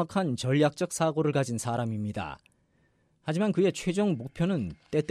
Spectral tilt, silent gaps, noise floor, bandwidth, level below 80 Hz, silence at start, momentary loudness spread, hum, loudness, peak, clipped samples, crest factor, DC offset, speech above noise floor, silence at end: -6 dB/octave; none; -68 dBFS; 13.5 kHz; -60 dBFS; 0 s; 9 LU; none; -29 LUFS; -14 dBFS; under 0.1%; 16 dB; under 0.1%; 40 dB; 0.05 s